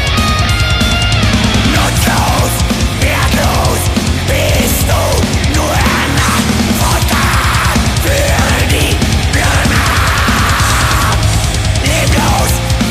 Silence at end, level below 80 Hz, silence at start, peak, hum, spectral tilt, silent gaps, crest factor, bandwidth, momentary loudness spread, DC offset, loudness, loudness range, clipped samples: 0 s; -18 dBFS; 0 s; 0 dBFS; none; -4 dB/octave; none; 10 dB; 15.5 kHz; 2 LU; under 0.1%; -11 LUFS; 1 LU; under 0.1%